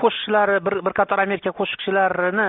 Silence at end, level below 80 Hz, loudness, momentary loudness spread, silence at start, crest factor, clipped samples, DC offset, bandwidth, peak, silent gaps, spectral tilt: 0 s; -60 dBFS; -20 LUFS; 5 LU; 0 s; 16 dB; under 0.1%; under 0.1%; 4.1 kHz; -4 dBFS; none; -2 dB/octave